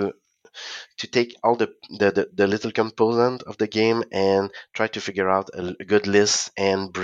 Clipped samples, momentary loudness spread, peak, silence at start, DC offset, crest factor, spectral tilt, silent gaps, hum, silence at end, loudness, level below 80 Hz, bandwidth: under 0.1%; 12 LU; -4 dBFS; 0 s; under 0.1%; 18 dB; -4 dB/octave; none; none; 0 s; -22 LUFS; -68 dBFS; 9.4 kHz